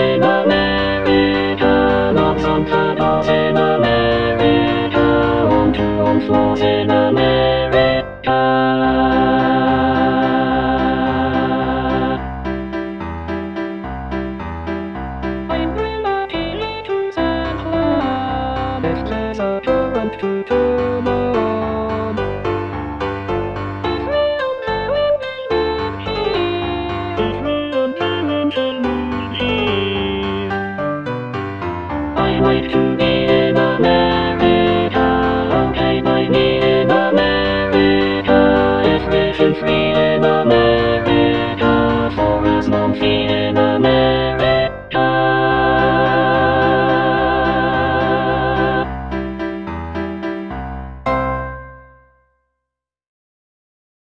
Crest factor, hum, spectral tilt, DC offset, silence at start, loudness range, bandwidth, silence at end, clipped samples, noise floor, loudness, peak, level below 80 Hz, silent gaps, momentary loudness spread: 16 dB; none; -8 dB/octave; 0.3%; 0 s; 8 LU; 7.4 kHz; 2.2 s; under 0.1%; -80 dBFS; -16 LUFS; 0 dBFS; -34 dBFS; none; 10 LU